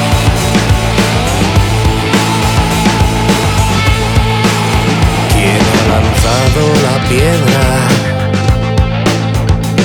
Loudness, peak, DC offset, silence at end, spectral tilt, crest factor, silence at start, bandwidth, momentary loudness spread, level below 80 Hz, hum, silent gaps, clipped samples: -10 LUFS; 0 dBFS; under 0.1%; 0 s; -5 dB/octave; 10 dB; 0 s; 19 kHz; 3 LU; -18 dBFS; none; none; under 0.1%